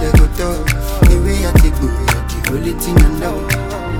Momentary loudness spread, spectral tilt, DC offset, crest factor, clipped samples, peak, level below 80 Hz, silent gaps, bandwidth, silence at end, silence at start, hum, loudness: 6 LU; -5.5 dB/octave; under 0.1%; 12 dB; under 0.1%; 0 dBFS; -14 dBFS; none; 18 kHz; 0 s; 0 s; none; -15 LUFS